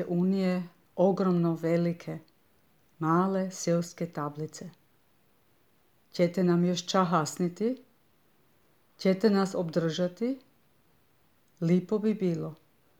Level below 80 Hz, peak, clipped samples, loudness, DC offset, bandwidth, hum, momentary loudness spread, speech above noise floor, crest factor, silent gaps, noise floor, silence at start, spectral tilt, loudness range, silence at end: -78 dBFS; -10 dBFS; under 0.1%; -29 LUFS; under 0.1%; 14 kHz; none; 14 LU; 40 dB; 20 dB; none; -68 dBFS; 0 s; -6.5 dB/octave; 3 LU; 0.45 s